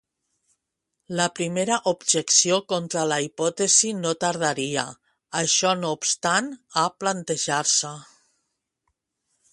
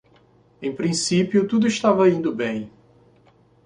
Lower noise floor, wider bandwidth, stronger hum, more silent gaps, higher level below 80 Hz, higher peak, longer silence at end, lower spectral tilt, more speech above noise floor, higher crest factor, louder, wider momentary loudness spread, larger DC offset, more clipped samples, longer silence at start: first, -80 dBFS vs -56 dBFS; about the same, 11.5 kHz vs 11 kHz; neither; neither; second, -70 dBFS vs -60 dBFS; about the same, -4 dBFS vs -4 dBFS; first, 1.5 s vs 0.95 s; second, -2 dB/octave vs -5 dB/octave; first, 57 dB vs 36 dB; about the same, 20 dB vs 18 dB; about the same, -22 LUFS vs -21 LUFS; second, 10 LU vs 14 LU; neither; neither; first, 1.1 s vs 0.6 s